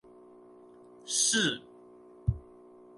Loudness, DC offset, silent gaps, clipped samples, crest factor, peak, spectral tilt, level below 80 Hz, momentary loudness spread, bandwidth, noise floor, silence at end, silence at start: -29 LUFS; under 0.1%; none; under 0.1%; 22 dB; -14 dBFS; -2 dB/octave; -48 dBFS; 18 LU; 12 kHz; -54 dBFS; 0.55 s; 1.05 s